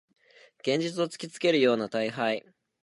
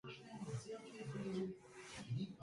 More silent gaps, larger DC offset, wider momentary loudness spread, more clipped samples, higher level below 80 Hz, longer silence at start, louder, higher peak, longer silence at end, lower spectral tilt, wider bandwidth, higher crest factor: neither; neither; about the same, 9 LU vs 9 LU; neither; second, -80 dBFS vs -74 dBFS; first, 0.65 s vs 0.05 s; first, -28 LUFS vs -48 LUFS; first, -10 dBFS vs -34 dBFS; first, 0.45 s vs 0 s; about the same, -5 dB/octave vs -6 dB/octave; about the same, 11.5 kHz vs 11.5 kHz; about the same, 18 dB vs 14 dB